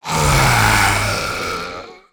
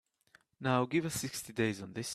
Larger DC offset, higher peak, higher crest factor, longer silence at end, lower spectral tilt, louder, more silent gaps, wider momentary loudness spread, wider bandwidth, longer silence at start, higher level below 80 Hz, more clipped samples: neither; first, 0 dBFS vs -16 dBFS; about the same, 16 dB vs 20 dB; first, 0.15 s vs 0 s; about the same, -3.5 dB/octave vs -4.5 dB/octave; first, -15 LUFS vs -34 LUFS; neither; first, 14 LU vs 8 LU; first, over 20 kHz vs 15.5 kHz; second, 0.05 s vs 0.6 s; first, -28 dBFS vs -68 dBFS; neither